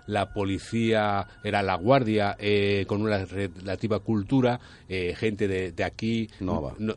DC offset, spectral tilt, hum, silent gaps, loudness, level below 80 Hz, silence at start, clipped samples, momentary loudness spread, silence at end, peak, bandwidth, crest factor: under 0.1%; -7 dB/octave; none; none; -27 LUFS; -50 dBFS; 0.05 s; under 0.1%; 8 LU; 0 s; -6 dBFS; 11 kHz; 20 dB